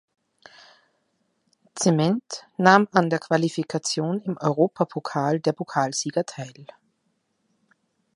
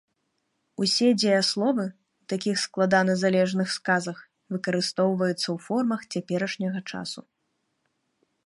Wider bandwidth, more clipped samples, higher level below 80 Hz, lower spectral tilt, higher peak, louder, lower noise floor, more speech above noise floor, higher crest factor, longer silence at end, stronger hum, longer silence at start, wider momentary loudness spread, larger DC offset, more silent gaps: about the same, 11.5 kHz vs 11.5 kHz; neither; about the same, -72 dBFS vs -74 dBFS; about the same, -5 dB/octave vs -4.5 dB/octave; first, 0 dBFS vs -8 dBFS; about the same, -23 LUFS vs -25 LUFS; second, -72 dBFS vs -76 dBFS; about the same, 50 dB vs 51 dB; first, 24 dB vs 18 dB; first, 1.5 s vs 1.25 s; neither; first, 1.75 s vs 0.8 s; about the same, 11 LU vs 13 LU; neither; neither